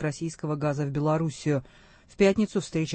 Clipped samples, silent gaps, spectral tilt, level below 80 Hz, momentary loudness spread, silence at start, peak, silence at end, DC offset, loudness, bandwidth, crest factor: under 0.1%; none; -6.5 dB/octave; -54 dBFS; 8 LU; 0 s; -8 dBFS; 0 s; under 0.1%; -27 LUFS; 8.8 kHz; 18 dB